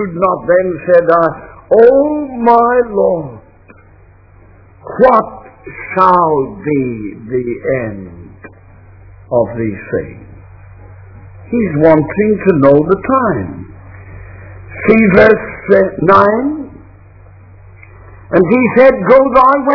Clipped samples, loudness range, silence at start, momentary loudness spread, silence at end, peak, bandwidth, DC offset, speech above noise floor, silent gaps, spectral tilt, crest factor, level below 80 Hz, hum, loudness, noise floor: 0.7%; 8 LU; 0 s; 18 LU; 0 s; 0 dBFS; 5.4 kHz; under 0.1%; 32 dB; none; -10 dB/octave; 12 dB; -40 dBFS; none; -11 LUFS; -42 dBFS